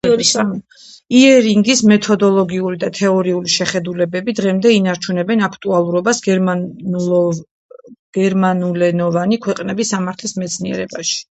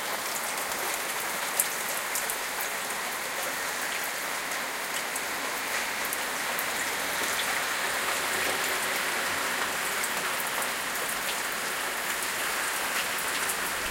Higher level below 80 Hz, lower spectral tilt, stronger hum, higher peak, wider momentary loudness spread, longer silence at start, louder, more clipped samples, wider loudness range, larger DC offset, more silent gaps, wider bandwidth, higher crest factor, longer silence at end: first, -56 dBFS vs -64 dBFS; first, -4.5 dB/octave vs 0 dB/octave; neither; first, 0 dBFS vs -4 dBFS; first, 10 LU vs 3 LU; about the same, 0.05 s vs 0 s; first, -15 LUFS vs -28 LUFS; neither; about the same, 5 LU vs 3 LU; neither; first, 7.51-7.69 s, 7.99-8.13 s vs none; second, 8.8 kHz vs 17 kHz; second, 14 dB vs 26 dB; about the same, 0.1 s vs 0 s